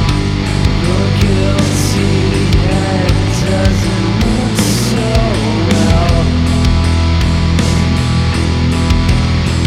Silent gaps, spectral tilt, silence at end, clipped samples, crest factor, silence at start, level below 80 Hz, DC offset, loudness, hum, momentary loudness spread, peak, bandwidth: none; -5.5 dB/octave; 0 s; under 0.1%; 12 dB; 0 s; -18 dBFS; under 0.1%; -13 LUFS; none; 2 LU; 0 dBFS; 15 kHz